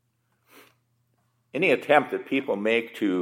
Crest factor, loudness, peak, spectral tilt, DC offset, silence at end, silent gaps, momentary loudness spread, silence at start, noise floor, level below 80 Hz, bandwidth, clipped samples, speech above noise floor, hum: 22 dB; -24 LUFS; -4 dBFS; -5.5 dB/octave; under 0.1%; 0 s; none; 7 LU; 1.55 s; -70 dBFS; -82 dBFS; 16.5 kHz; under 0.1%; 47 dB; none